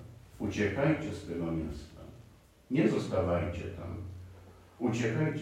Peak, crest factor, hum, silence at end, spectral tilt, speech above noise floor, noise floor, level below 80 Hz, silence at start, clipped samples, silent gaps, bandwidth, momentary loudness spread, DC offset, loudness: -14 dBFS; 18 dB; none; 0 s; -7 dB/octave; 26 dB; -58 dBFS; -56 dBFS; 0 s; under 0.1%; none; 13.5 kHz; 21 LU; under 0.1%; -33 LUFS